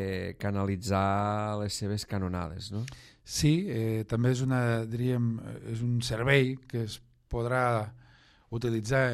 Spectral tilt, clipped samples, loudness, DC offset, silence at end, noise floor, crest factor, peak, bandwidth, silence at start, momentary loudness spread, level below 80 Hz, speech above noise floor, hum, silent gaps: -6 dB/octave; under 0.1%; -30 LUFS; under 0.1%; 0 s; -59 dBFS; 18 dB; -12 dBFS; 14 kHz; 0 s; 12 LU; -52 dBFS; 30 dB; none; none